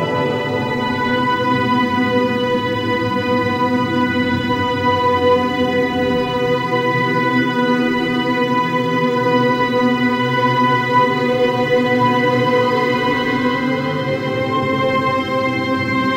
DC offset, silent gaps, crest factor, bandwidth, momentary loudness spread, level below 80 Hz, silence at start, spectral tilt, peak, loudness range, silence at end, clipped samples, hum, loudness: under 0.1%; none; 14 dB; 16 kHz; 4 LU; -50 dBFS; 0 s; -6.5 dB/octave; -2 dBFS; 2 LU; 0 s; under 0.1%; none; -17 LUFS